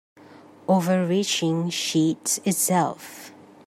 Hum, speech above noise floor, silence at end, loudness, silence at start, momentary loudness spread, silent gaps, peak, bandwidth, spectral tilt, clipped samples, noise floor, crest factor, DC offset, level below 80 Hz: none; 25 dB; 0.35 s; -23 LUFS; 0.35 s; 15 LU; none; -8 dBFS; 15.5 kHz; -4 dB/octave; under 0.1%; -48 dBFS; 16 dB; under 0.1%; -72 dBFS